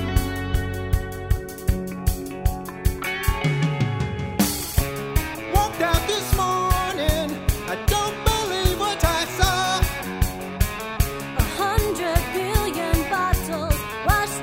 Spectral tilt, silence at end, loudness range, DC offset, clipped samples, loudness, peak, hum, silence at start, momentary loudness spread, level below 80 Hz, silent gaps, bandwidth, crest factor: -4.5 dB/octave; 0 s; 3 LU; under 0.1%; under 0.1%; -23 LUFS; -4 dBFS; none; 0 s; 6 LU; -28 dBFS; none; 16.5 kHz; 20 dB